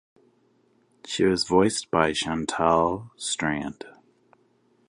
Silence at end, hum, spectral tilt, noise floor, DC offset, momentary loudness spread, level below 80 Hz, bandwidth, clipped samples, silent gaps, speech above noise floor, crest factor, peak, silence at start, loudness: 1 s; none; -4 dB/octave; -64 dBFS; under 0.1%; 12 LU; -52 dBFS; 11.5 kHz; under 0.1%; none; 40 dB; 24 dB; -4 dBFS; 1.05 s; -24 LUFS